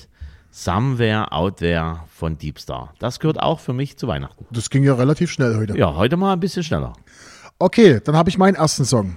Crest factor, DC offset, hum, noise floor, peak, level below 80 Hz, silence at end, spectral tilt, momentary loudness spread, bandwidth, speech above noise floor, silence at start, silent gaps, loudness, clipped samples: 18 dB; under 0.1%; none; -40 dBFS; 0 dBFS; -40 dBFS; 0 s; -6 dB/octave; 13 LU; 15 kHz; 21 dB; 0.2 s; none; -19 LUFS; under 0.1%